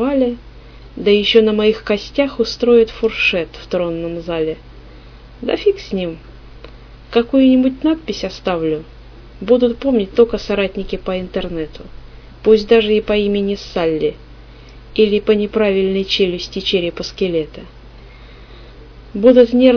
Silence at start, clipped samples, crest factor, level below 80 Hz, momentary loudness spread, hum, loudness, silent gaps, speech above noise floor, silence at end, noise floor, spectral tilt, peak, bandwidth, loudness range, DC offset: 0 s; under 0.1%; 16 dB; -38 dBFS; 13 LU; none; -16 LUFS; none; 23 dB; 0 s; -38 dBFS; -6 dB/octave; 0 dBFS; 5.4 kHz; 5 LU; under 0.1%